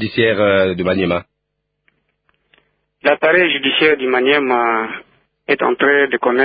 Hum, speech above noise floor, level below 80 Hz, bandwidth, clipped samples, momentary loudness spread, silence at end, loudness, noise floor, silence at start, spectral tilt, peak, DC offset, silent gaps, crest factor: none; 59 dB; -50 dBFS; 5 kHz; under 0.1%; 8 LU; 0 s; -15 LUFS; -73 dBFS; 0 s; -10 dB/octave; 0 dBFS; under 0.1%; none; 16 dB